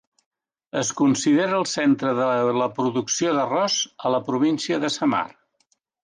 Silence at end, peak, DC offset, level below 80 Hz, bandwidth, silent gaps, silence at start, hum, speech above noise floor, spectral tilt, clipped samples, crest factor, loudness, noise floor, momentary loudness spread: 0.75 s; -10 dBFS; under 0.1%; -70 dBFS; 10 kHz; none; 0.75 s; none; 47 dB; -4 dB/octave; under 0.1%; 14 dB; -22 LUFS; -69 dBFS; 5 LU